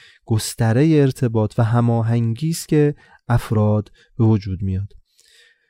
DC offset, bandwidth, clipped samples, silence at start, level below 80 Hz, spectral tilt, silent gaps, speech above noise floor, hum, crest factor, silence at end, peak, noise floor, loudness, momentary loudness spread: under 0.1%; 16 kHz; under 0.1%; 0.3 s; -44 dBFS; -7 dB/octave; none; 36 dB; none; 14 dB; 0.8 s; -4 dBFS; -54 dBFS; -19 LUFS; 9 LU